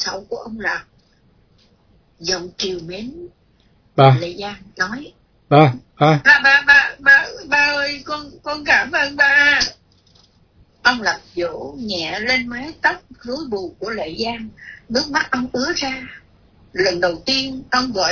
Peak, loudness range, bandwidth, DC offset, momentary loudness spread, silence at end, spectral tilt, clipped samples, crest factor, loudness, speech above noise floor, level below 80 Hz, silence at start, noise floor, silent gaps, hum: 0 dBFS; 9 LU; 5.4 kHz; under 0.1%; 18 LU; 0 s; -4 dB/octave; under 0.1%; 18 dB; -16 LUFS; 38 dB; -50 dBFS; 0 s; -56 dBFS; none; none